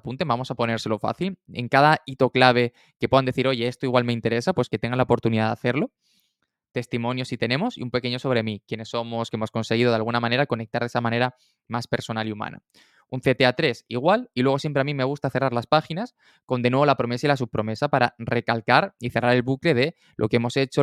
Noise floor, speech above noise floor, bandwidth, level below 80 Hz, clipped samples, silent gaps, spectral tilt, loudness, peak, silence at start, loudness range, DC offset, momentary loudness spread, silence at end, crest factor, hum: -74 dBFS; 51 dB; 13 kHz; -58 dBFS; under 0.1%; 2.96-3.00 s, 16.43-16.48 s; -6.5 dB/octave; -23 LUFS; -2 dBFS; 0.05 s; 5 LU; under 0.1%; 10 LU; 0 s; 22 dB; none